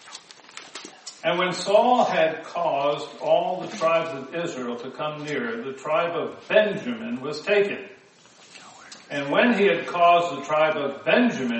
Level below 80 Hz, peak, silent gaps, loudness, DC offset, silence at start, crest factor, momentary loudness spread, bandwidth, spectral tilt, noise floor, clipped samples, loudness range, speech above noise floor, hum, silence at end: -74 dBFS; -4 dBFS; none; -23 LUFS; under 0.1%; 0.05 s; 20 dB; 20 LU; 8.4 kHz; -4.5 dB/octave; -52 dBFS; under 0.1%; 4 LU; 29 dB; none; 0 s